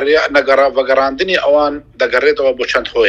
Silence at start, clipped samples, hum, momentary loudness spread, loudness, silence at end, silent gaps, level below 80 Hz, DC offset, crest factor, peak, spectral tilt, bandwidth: 0 s; under 0.1%; none; 4 LU; -13 LUFS; 0 s; none; -44 dBFS; under 0.1%; 12 dB; 0 dBFS; -3.5 dB/octave; 8.2 kHz